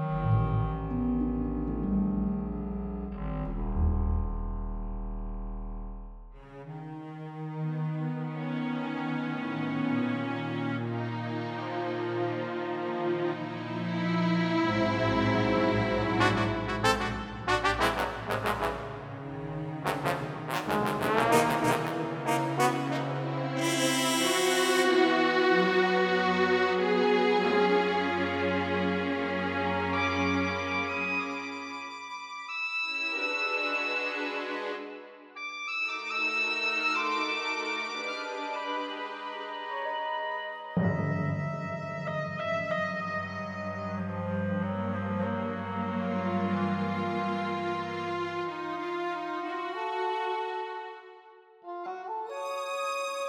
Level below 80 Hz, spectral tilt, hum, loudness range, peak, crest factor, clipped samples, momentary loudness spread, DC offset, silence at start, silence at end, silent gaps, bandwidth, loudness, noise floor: -44 dBFS; -5 dB/octave; none; 9 LU; -6 dBFS; 24 dB; under 0.1%; 13 LU; under 0.1%; 0 s; 0 s; none; 18.5 kHz; -30 LUFS; -54 dBFS